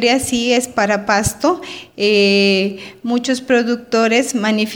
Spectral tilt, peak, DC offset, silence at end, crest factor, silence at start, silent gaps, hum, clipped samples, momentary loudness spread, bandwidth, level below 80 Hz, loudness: -3.5 dB/octave; 0 dBFS; under 0.1%; 0 s; 16 dB; 0 s; none; none; under 0.1%; 9 LU; over 20 kHz; -44 dBFS; -15 LUFS